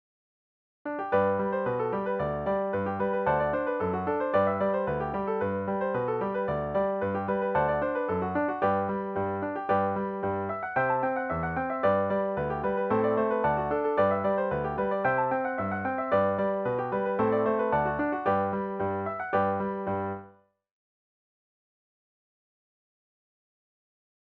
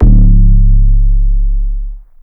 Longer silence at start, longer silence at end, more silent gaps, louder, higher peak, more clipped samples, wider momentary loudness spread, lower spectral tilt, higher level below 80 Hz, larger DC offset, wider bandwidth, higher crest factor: first, 0.85 s vs 0 s; first, 4.05 s vs 0.25 s; neither; second, -28 LUFS vs -12 LUFS; second, -14 dBFS vs 0 dBFS; second, under 0.1% vs 1%; second, 5 LU vs 14 LU; second, -10 dB/octave vs -14 dB/octave; second, -54 dBFS vs -6 dBFS; neither; first, 5.2 kHz vs 0.8 kHz; first, 16 dB vs 6 dB